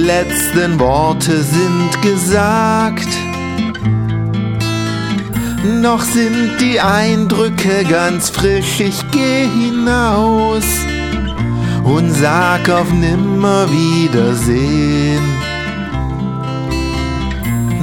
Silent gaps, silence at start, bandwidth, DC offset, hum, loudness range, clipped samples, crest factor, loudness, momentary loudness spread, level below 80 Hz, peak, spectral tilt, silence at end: none; 0 s; 19 kHz; under 0.1%; none; 3 LU; under 0.1%; 14 dB; -14 LUFS; 6 LU; -28 dBFS; 0 dBFS; -5 dB/octave; 0 s